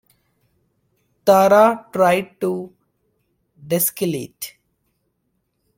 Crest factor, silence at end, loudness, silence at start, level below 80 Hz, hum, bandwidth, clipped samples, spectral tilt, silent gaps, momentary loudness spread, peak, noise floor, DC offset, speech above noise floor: 20 dB; 1.3 s; -17 LUFS; 1.25 s; -64 dBFS; none; 17 kHz; under 0.1%; -4.5 dB/octave; none; 19 LU; -2 dBFS; -71 dBFS; under 0.1%; 54 dB